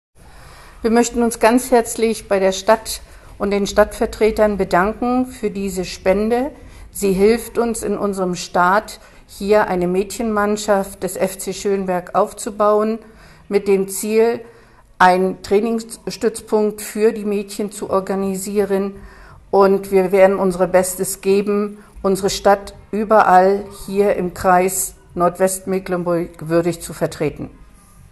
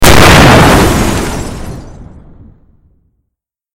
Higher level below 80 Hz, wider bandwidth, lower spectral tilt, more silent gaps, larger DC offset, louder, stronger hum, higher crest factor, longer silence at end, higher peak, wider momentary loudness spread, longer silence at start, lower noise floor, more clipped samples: second, -42 dBFS vs -18 dBFS; second, 13 kHz vs over 20 kHz; about the same, -5 dB/octave vs -4.5 dB/octave; neither; neither; second, -18 LUFS vs -5 LUFS; neither; first, 18 dB vs 8 dB; second, 0.6 s vs 1.7 s; about the same, 0 dBFS vs 0 dBFS; second, 10 LU vs 22 LU; first, 0.4 s vs 0 s; second, -44 dBFS vs -72 dBFS; second, under 0.1% vs 3%